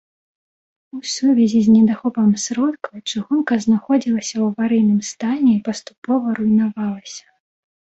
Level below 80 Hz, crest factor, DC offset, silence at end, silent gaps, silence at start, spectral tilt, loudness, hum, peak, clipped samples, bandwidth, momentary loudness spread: -60 dBFS; 14 dB; under 0.1%; 0.75 s; 5.98-6.02 s; 0.95 s; -5.5 dB/octave; -18 LUFS; none; -4 dBFS; under 0.1%; 8.2 kHz; 14 LU